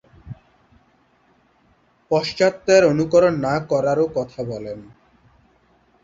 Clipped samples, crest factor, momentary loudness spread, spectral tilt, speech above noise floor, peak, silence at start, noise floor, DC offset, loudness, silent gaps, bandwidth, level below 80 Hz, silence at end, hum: under 0.1%; 20 dB; 25 LU; -5.5 dB/octave; 41 dB; -2 dBFS; 0.25 s; -59 dBFS; under 0.1%; -19 LUFS; none; 7.8 kHz; -54 dBFS; 1.2 s; none